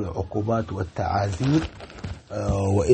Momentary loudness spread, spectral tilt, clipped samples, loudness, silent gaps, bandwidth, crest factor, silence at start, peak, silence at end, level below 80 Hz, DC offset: 13 LU; -7 dB/octave; under 0.1%; -26 LUFS; none; 8.8 kHz; 20 dB; 0 s; -4 dBFS; 0 s; -40 dBFS; under 0.1%